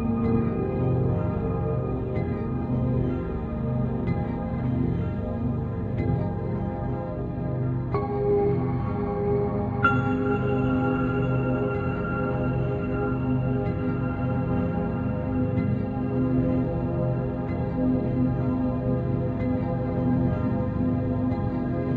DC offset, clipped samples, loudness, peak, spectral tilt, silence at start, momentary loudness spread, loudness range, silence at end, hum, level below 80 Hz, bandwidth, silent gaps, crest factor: under 0.1%; under 0.1%; -26 LUFS; -8 dBFS; -11 dB/octave; 0 s; 4 LU; 3 LU; 0 s; none; -38 dBFS; 4.3 kHz; none; 18 dB